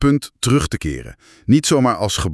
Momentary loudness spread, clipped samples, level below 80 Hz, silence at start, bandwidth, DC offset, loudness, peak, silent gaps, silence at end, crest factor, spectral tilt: 13 LU; under 0.1%; -34 dBFS; 0 s; 12 kHz; under 0.1%; -17 LUFS; -2 dBFS; none; 0 s; 16 dB; -5 dB/octave